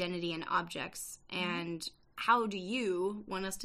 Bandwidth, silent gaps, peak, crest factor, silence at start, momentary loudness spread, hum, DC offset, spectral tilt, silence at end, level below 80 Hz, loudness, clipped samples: 15 kHz; none; -14 dBFS; 20 dB; 0 s; 11 LU; none; under 0.1%; -4 dB/octave; 0 s; -66 dBFS; -35 LUFS; under 0.1%